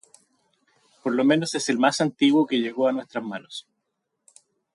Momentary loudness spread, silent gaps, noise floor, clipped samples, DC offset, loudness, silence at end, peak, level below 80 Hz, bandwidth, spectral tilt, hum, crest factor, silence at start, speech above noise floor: 14 LU; none; -78 dBFS; under 0.1%; under 0.1%; -23 LUFS; 1.15 s; -6 dBFS; -76 dBFS; 11.5 kHz; -4.5 dB/octave; none; 18 dB; 1.05 s; 56 dB